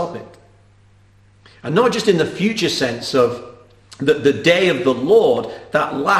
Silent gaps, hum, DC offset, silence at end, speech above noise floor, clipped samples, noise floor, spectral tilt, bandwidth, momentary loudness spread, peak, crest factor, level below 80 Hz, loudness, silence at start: none; 50 Hz at -45 dBFS; under 0.1%; 0 s; 34 dB; under 0.1%; -51 dBFS; -5 dB/octave; 13.5 kHz; 8 LU; 0 dBFS; 18 dB; -54 dBFS; -17 LUFS; 0 s